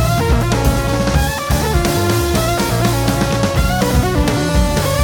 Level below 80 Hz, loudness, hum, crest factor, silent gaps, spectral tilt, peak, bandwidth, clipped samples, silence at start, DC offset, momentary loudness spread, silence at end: -20 dBFS; -15 LUFS; none; 12 dB; none; -5 dB/octave; -2 dBFS; 18 kHz; under 0.1%; 0 s; under 0.1%; 1 LU; 0 s